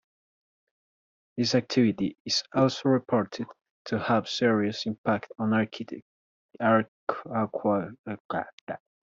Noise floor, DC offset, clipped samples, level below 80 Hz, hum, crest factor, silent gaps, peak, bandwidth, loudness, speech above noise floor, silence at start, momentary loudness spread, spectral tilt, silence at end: under -90 dBFS; under 0.1%; under 0.1%; -70 dBFS; none; 18 dB; 2.20-2.25 s, 3.70-3.85 s, 4.98-5.04 s, 6.02-6.49 s, 6.88-7.07 s, 7.99-8.04 s, 8.20-8.29 s, 8.53-8.67 s; -10 dBFS; 7.6 kHz; -27 LUFS; over 63 dB; 1.35 s; 15 LU; -5.5 dB/octave; 0.25 s